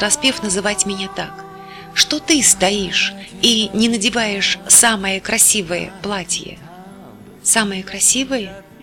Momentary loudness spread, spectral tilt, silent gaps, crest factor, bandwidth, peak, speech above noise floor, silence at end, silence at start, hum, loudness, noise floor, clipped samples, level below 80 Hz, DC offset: 14 LU; -1 dB/octave; none; 16 dB; 19.5 kHz; -2 dBFS; 22 dB; 0.2 s; 0 s; none; -15 LUFS; -39 dBFS; under 0.1%; -48 dBFS; under 0.1%